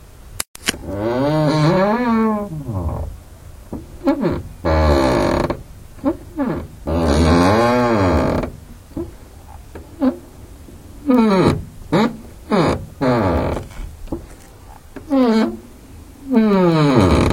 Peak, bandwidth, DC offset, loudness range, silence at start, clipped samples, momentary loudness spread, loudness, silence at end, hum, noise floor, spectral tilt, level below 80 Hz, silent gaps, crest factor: 0 dBFS; 16.5 kHz; under 0.1%; 4 LU; 0.25 s; under 0.1%; 20 LU; -18 LUFS; 0 s; none; -40 dBFS; -6.5 dB/octave; -30 dBFS; 0.48-0.54 s; 18 dB